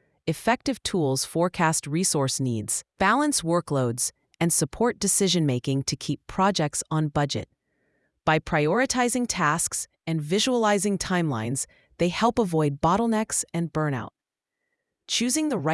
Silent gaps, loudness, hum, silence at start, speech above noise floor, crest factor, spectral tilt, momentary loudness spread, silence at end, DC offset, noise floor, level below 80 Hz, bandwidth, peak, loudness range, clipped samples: none; -24 LUFS; none; 0.25 s; 61 dB; 18 dB; -4 dB/octave; 7 LU; 0 s; under 0.1%; -85 dBFS; -52 dBFS; 12 kHz; -6 dBFS; 2 LU; under 0.1%